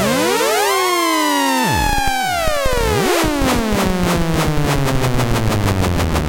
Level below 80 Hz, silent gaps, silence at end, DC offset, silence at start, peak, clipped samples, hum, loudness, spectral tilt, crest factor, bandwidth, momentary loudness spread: -26 dBFS; none; 0 s; under 0.1%; 0 s; -4 dBFS; under 0.1%; none; -16 LUFS; -4.5 dB/octave; 12 dB; 17.5 kHz; 3 LU